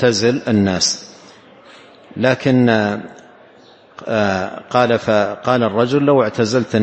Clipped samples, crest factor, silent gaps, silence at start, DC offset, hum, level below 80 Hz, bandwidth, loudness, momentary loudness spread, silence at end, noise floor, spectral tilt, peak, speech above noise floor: under 0.1%; 16 dB; none; 0 s; under 0.1%; none; -56 dBFS; 8.6 kHz; -16 LUFS; 9 LU; 0 s; -46 dBFS; -5 dB/octave; 0 dBFS; 30 dB